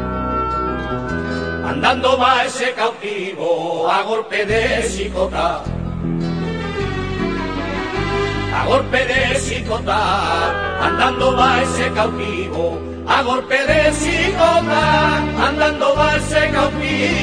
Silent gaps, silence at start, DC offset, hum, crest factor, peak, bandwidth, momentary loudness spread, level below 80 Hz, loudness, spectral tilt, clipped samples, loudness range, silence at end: none; 0 s; 0.2%; none; 16 dB; 0 dBFS; 10.5 kHz; 8 LU; -32 dBFS; -17 LUFS; -4.5 dB/octave; under 0.1%; 5 LU; 0 s